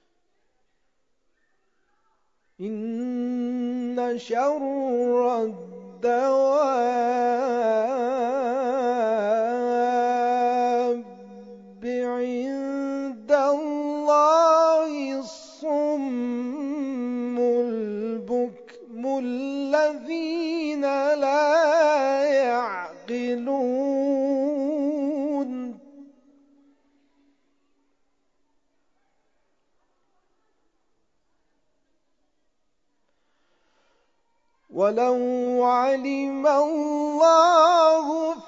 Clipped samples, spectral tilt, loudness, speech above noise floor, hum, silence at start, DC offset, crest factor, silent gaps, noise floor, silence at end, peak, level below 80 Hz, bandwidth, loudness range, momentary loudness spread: under 0.1%; -4.5 dB/octave; -23 LUFS; 53 dB; none; 2.6 s; under 0.1%; 20 dB; none; -76 dBFS; 0 s; -4 dBFS; -76 dBFS; 7.8 kHz; 8 LU; 12 LU